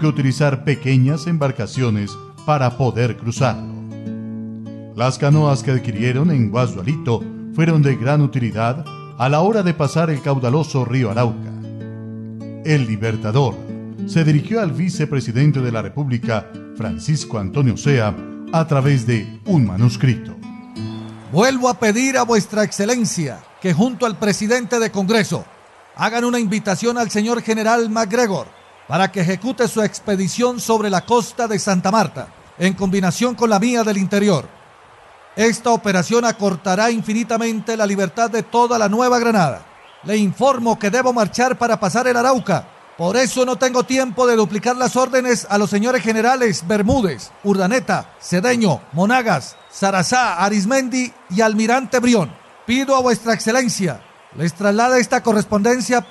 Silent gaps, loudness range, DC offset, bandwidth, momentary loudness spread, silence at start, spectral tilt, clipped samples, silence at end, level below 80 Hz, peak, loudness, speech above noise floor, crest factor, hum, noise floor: none; 3 LU; under 0.1%; 12.5 kHz; 11 LU; 0 s; -5.5 dB/octave; under 0.1%; 0 s; -48 dBFS; -4 dBFS; -18 LUFS; 28 dB; 14 dB; none; -45 dBFS